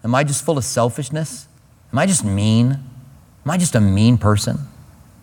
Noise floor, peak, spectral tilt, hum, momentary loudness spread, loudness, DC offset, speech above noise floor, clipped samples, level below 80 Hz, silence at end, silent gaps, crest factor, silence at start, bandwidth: -44 dBFS; 0 dBFS; -5.5 dB/octave; none; 13 LU; -18 LUFS; under 0.1%; 27 dB; under 0.1%; -48 dBFS; 0.4 s; none; 18 dB; 0.05 s; 18 kHz